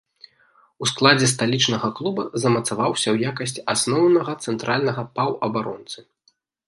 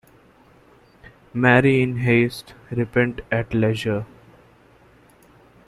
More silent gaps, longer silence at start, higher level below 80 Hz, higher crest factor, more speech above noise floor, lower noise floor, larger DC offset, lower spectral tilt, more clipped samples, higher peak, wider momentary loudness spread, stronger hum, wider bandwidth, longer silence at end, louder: neither; second, 0.8 s vs 1.35 s; second, -62 dBFS vs -50 dBFS; about the same, 22 dB vs 22 dB; first, 44 dB vs 33 dB; first, -65 dBFS vs -53 dBFS; neither; second, -4 dB/octave vs -7.5 dB/octave; neither; about the same, 0 dBFS vs -2 dBFS; second, 10 LU vs 15 LU; neither; second, 11.5 kHz vs 13 kHz; second, 0.65 s vs 1.6 s; about the same, -21 LUFS vs -20 LUFS